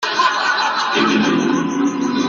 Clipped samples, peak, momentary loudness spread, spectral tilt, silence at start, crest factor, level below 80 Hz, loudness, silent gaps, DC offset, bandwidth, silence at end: under 0.1%; -4 dBFS; 4 LU; -3.5 dB/octave; 0 s; 14 dB; -60 dBFS; -16 LUFS; none; under 0.1%; 7.6 kHz; 0 s